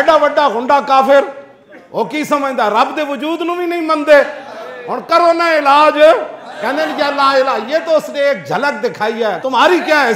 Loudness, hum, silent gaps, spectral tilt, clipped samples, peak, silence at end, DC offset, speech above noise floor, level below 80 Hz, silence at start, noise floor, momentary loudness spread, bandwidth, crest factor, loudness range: -13 LUFS; none; none; -4 dB/octave; under 0.1%; 0 dBFS; 0 s; under 0.1%; 27 dB; -58 dBFS; 0 s; -39 dBFS; 12 LU; 16 kHz; 12 dB; 3 LU